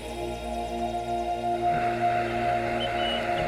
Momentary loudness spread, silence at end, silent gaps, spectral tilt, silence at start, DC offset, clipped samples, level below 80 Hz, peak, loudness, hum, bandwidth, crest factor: 7 LU; 0 s; none; -5 dB/octave; 0 s; under 0.1%; under 0.1%; -44 dBFS; -16 dBFS; -28 LUFS; none; 15.5 kHz; 12 dB